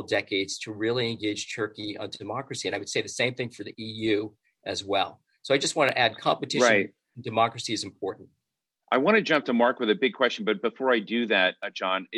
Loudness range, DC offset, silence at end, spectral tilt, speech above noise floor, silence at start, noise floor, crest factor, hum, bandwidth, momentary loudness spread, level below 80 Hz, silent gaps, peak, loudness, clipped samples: 6 LU; under 0.1%; 0 s; -3.5 dB/octave; 57 dB; 0 s; -83 dBFS; 20 dB; none; 12.5 kHz; 13 LU; -72 dBFS; none; -6 dBFS; -26 LUFS; under 0.1%